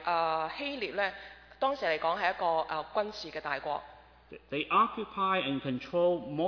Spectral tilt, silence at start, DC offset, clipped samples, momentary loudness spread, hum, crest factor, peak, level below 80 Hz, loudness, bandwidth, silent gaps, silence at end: -6 dB/octave; 0 s; under 0.1%; under 0.1%; 8 LU; none; 18 dB; -14 dBFS; -64 dBFS; -32 LUFS; 5.4 kHz; none; 0 s